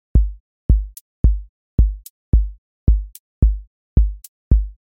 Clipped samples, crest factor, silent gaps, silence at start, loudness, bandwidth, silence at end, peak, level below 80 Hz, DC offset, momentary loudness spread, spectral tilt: under 0.1%; 16 dB; 0.40-0.69 s, 1.01-1.24 s, 1.49-1.78 s, 2.10-2.32 s, 2.58-2.87 s, 3.19-3.42 s, 3.67-3.96 s, 4.28-4.51 s; 0.15 s; -21 LUFS; 14 kHz; 0.2 s; -2 dBFS; -18 dBFS; under 0.1%; 11 LU; -9.5 dB/octave